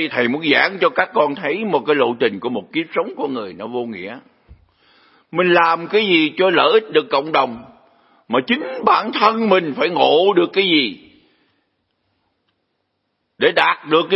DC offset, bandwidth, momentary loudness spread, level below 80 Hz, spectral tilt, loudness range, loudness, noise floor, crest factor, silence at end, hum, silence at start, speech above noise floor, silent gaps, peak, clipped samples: under 0.1%; 5.8 kHz; 11 LU; -64 dBFS; -7 dB/octave; 6 LU; -17 LUFS; -71 dBFS; 18 dB; 0 s; none; 0 s; 54 dB; none; 0 dBFS; under 0.1%